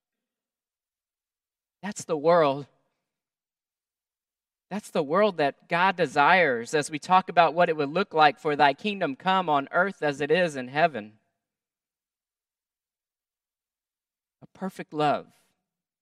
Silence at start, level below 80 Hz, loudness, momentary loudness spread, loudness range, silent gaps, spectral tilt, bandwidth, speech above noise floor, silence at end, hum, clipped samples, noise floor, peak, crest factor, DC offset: 1.85 s; -80 dBFS; -24 LUFS; 15 LU; 12 LU; none; -5 dB/octave; 13 kHz; over 66 dB; 0.8 s; none; under 0.1%; under -90 dBFS; -4 dBFS; 24 dB; under 0.1%